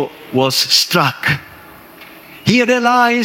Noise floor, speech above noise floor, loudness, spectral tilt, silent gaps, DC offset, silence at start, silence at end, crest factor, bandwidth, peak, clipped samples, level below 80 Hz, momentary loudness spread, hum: -39 dBFS; 25 dB; -13 LUFS; -3.5 dB/octave; none; under 0.1%; 0 s; 0 s; 16 dB; 19 kHz; 0 dBFS; under 0.1%; -54 dBFS; 9 LU; none